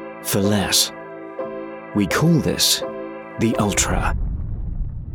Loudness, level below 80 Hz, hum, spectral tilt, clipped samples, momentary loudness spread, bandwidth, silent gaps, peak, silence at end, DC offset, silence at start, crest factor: -20 LUFS; -32 dBFS; none; -3.5 dB/octave; under 0.1%; 15 LU; 18 kHz; none; -4 dBFS; 0 s; under 0.1%; 0 s; 16 dB